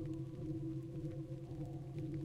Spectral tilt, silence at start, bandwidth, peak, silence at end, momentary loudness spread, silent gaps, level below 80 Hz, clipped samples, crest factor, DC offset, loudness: -9.5 dB/octave; 0 s; 10 kHz; -32 dBFS; 0 s; 3 LU; none; -60 dBFS; under 0.1%; 12 dB; under 0.1%; -46 LUFS